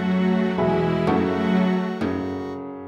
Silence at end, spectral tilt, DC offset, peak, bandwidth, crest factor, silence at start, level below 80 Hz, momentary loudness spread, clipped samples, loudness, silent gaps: 0 s; -8.5 dB/octave; under 0.1%; -8 dBFS; 7 kHz; 14 dB; 0 s; -52 dBFS; 8 LU; under 0.1%; -22 LUFS; none